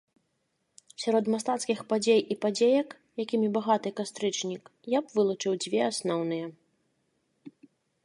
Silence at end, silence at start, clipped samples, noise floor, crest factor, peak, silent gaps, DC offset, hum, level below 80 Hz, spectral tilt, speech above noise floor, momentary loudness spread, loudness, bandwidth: 0.55 s; 1 s; under 0.1%; -77 dBFS; 18 dB; -12 dBFS; none; under 0.1%; none; -82 dBFS; -4.5 dB/octave; 49 dB; 11 LU; -28 LUFS; 11.5 kHz